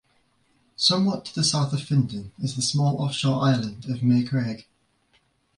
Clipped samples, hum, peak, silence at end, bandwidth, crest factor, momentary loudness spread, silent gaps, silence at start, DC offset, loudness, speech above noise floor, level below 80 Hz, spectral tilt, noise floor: under 0.1%; none; -8 dBFS; 0.95 s; 11.5 kHz; 18 dB; 10 LU; none; 0.8 s; under 0.1%; -24 LUFS; 42 dB; -58 dBFS; -5 dB/octave; -66 dBFS